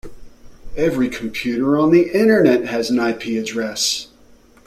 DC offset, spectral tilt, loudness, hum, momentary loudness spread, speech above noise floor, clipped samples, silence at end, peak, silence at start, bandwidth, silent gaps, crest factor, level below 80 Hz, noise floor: under 0.1%; -4.5 dB/octave; -17 LUFS; none; 10 LU; 31 dB; under 0.1%; 0.6 s; -2 dBFS; 0.05 s; 15 kHz; none; 16 dB; -44 dBFS; -48 dBFS